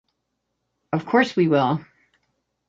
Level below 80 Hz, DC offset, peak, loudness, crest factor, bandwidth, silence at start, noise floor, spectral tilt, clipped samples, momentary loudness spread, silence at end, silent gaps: -66 dBFS; under 0.1%; -4 dBFS; -21 LUFS; 20 dB; 7.8 kHz; 0.9 s; -77 dBFS; -7 dB/octave; under 0.1%; 10 LU; 0.9 s; none